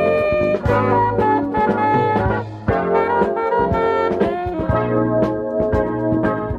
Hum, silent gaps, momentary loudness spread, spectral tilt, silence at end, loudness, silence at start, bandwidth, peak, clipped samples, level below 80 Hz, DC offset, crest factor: none; none; 4 LU; -9 dB/octave; 0 s; -18 LUFS; 0 s; 8.2 kHz; -4 dBFS; under 0.1%; -36 dBFS; under 0.1%; 14 dB